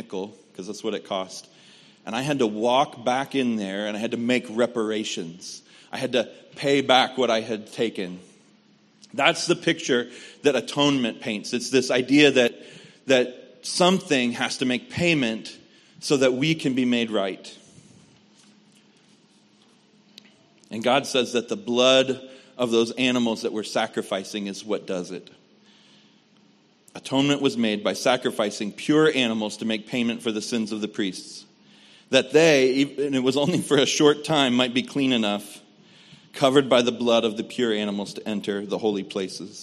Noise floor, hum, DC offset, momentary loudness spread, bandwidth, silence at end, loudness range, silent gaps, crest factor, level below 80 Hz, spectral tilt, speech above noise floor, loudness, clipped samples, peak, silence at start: -59 dBFS; none; under 0.1%; 16 LU; 13 kHz; 0 s; 6 LU; none; 22 dB; -70 dBFS; -4 dB/octave; 35 dB; -23 LUFS; under 0.1%; -2 dBFS; 0 s